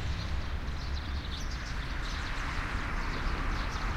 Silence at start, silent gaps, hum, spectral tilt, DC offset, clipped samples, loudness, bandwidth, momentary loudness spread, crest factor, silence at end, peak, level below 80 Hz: 0 s; none; none; -4.5 dB/octave; under 0.1%; under 0.1%; -36 LUFS; 12.5 kHz; 3 LU; 14 dB; 0 s; -20 dBFS; -36 dBFS